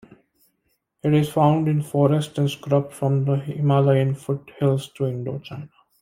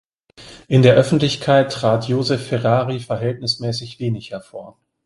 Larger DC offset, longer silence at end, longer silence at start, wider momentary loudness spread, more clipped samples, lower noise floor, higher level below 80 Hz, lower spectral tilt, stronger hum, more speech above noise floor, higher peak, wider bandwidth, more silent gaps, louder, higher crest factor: neither; about the same, 0.35 s vs 0.35 s; first, 1.05 s vs 0.4 s; second, 11 LU vs 15 LU; neither; first, -71 dBFS vs -44 dBFS; second, -60 dBFS vs -52 dBFS; first, -8 dB/octave vs -6.5 dB/octave; neither; first, 51 dB vs 26 dB; second, -4 dBFS vs 0 dBFS; first, 15 kHz vs 11.5 kHz; neither; second, -22 LUFS vs -18 LUFS; about the same, 18 dB vs 18 dB